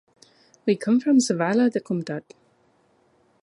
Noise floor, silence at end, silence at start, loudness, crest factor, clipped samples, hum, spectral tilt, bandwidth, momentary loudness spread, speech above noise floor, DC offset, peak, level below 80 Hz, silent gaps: -63 dBFS; 1.2 s; 0.65 s; -22 LUFS; 16 dB; under 0.1%; none; -5.5 dB/octave; 11.5 kHz; 12 LU; 41 dB; under 0.1%; -8 dBFS; -74 dBFS; none